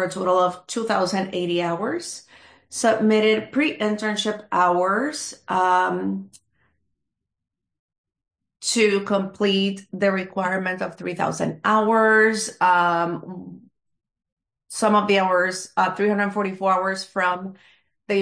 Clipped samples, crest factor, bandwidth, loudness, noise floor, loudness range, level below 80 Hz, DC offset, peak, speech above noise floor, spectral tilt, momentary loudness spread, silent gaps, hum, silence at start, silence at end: under 0.1%; 16 dB; 10.5 kHz; -21 LUFS; -81 dBFS; 5 LU; -68 dBFS; under 0.1%; -6 dBFS; 60 dB; -4 dB/octave; 11 LU; 7.79-7.88 s, 7.98-8.04 s, 14.32-14.37 s; none; 0 s; 0 s